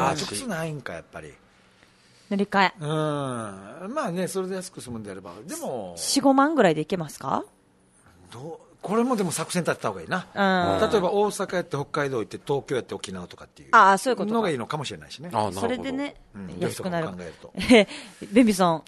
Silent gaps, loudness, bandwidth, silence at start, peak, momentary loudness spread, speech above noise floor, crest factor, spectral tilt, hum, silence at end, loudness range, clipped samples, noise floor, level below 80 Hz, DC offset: none; -24 LUFS; 12.5 kHz; 0 s; -4 dBFS; 20 LU; 35 dB; 22 dB; -4.5 dB/octave; none; 0.1 s; 5 LU; under 0.1%; -60 dBFS; -58 dBFS; under 0.1%